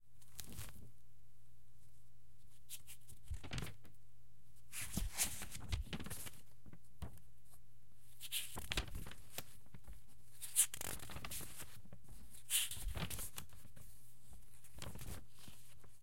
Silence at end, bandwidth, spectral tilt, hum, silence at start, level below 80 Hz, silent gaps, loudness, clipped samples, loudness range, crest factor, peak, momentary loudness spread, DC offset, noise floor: 0 s; 16.5 kHz; -2 dB/octave; none; 0 s; -56 dBFS; none; -44 LUFS; under 0.1%; 13 LU; 32 dB; -16 dBFS; 25 LU; 0.6%; -69 dBFS